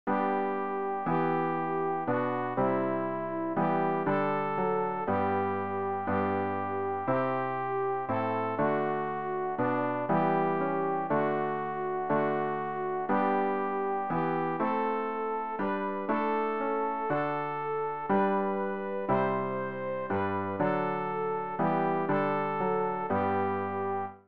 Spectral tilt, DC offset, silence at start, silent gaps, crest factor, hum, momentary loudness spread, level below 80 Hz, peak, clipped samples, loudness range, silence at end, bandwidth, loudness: -6 dB/octave; 0.3%; 0.05 s; none; 14 dB; none; 4 LU; -66 dBFS; -16 dBFS; under 0.1%; 1 LU; 0 s; 5 kHz; -30 LUFS